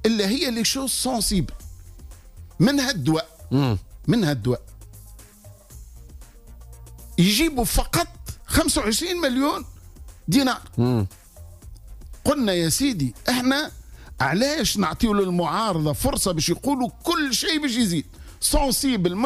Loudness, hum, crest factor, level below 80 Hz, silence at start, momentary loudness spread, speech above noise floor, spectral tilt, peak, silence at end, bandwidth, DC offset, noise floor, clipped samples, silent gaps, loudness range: -22 LUFS; none; 16 dB; -38 dBFS; 0 s; 7 LU; 25 dB; -4 dB/octave; -8 dBFS; 0 s; 15.5 kHz; under 0.1%; -47 dBFS; under 0.1%; none; 4 LU